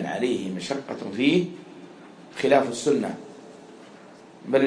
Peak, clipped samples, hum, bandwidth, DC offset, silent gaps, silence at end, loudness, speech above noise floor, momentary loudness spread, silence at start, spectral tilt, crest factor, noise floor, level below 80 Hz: -6 dBFS; under 0.1%; none; 10.5 kHz; under 0.1%; none; 0 s; -25 LUFS; 23 dB; 25 LU; 0 s; -5 dB/octave; 20 dB; -47 dBFS; -70 dBFS